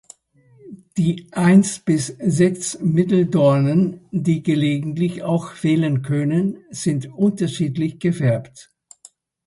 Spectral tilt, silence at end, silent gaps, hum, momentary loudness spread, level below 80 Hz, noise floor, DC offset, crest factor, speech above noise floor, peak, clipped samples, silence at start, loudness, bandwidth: -6.5 dB/octave; 0.85 s; none; none; 8 LU; -58 dBFS; -55 dBFS; under 0.1%; 16 dB; 36 dB; -2 dBFS; under 0.1%; 0.65 s; -19 LUFS; 11.5 kHz